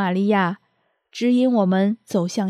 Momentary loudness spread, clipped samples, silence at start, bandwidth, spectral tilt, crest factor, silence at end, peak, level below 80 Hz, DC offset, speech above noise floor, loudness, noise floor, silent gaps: 10 LU; under 0.1%; 0 s; 13 kHz; -6.5 dB/octave; 14 dB; 0 s; -6 dBFS; -78 dBFS; under 0.1%; 49 dB; -20 LUFS; -68 dBFS; none